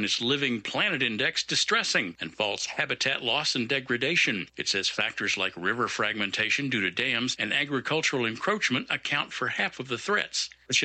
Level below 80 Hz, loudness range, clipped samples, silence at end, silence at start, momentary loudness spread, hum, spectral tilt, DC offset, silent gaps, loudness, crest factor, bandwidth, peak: -68 dBFS; 1 LU; under 0.1%; 0 s; 0 s; 5 LU; none; -2.5 dB/octave; under 0.1%; none; -26 LUFS; 18 dB; 9.2 kHz; -10 dBFS